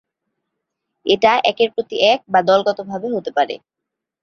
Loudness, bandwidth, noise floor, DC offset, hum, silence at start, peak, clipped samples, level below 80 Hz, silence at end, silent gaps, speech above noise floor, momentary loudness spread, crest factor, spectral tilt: -17 LUFS; 6.8 kHz; -82 dBFS; under 0.1%; none; 1.05 s; 0 dBFS; under 0.1%; -62 dBFS; 0.65 s; none; 65 dB; 10 LU; 18 dB; -4.5 dB/octave